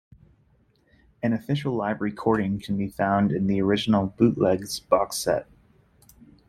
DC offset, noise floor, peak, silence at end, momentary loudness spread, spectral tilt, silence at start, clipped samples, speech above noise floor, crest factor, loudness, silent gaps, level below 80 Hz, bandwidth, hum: under 0.1%; -63 dBFS; -4 dBFS; 1.05 s; 6 LU; -6 dB/octave; 1.25 s; under 0.1%; 39 dB; 22 dB; -24 LUFS; none; -54 dBFS; 14.5 kHz; none